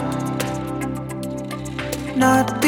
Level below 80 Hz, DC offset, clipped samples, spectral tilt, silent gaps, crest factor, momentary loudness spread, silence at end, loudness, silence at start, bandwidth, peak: -44 dBFS; under 0.1%; under 0.1%; -5 dB/octave; none; 20 dB; 12 LU; 0 s; -23 LUFS; 0 s; 19 kHz; -2 dBFS